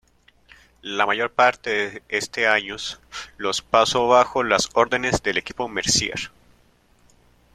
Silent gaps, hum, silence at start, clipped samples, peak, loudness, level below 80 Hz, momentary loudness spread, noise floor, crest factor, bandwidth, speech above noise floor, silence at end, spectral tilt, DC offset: none; none; 0.85 s; under 0.1%; -2 dBFS; -21 LUFS; -50 dBFS; 13 LU; -58 dBFS; 20 dB; 14.5 kHz; 37 dB; 1.25 s; -2.5 dB/octave; under 0.1%